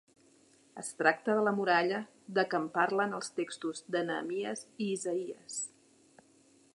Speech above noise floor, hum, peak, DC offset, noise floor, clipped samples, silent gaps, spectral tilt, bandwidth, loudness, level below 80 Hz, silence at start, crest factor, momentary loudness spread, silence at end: 32 dB; none; -10 dBFS; under 0.1%; -64 dBFS; under 0.1%; none; -4 dB/octave; 11.5 kHz; -33 LUFS; -86 dBFS; 0.75 s; 24 dB; 11 LU; 1.1 s